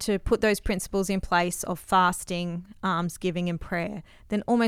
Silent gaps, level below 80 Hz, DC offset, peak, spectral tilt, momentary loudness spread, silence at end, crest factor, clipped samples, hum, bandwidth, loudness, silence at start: none; -42 dBFS; under 0.1%; -10 dBFS; -5 dB/octave; 9 LU; 0 s; 18 dB; under 0.1%; none; 16 kHz; -27 LUFS; 0 s